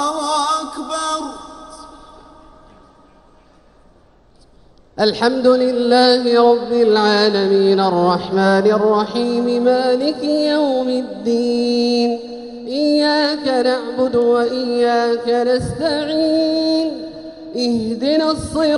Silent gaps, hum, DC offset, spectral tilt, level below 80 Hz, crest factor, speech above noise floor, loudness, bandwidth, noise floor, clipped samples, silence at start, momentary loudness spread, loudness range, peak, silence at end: none; none; under 0.1%; -5 dB/octave; -48 dBFS; 16 dB; 35 dB; -16 LUFS; 11.5 kHz; -50 dBFS; under 0.1%; 0 s; 11 LU; 10 LU; 0 dBFS; 0 s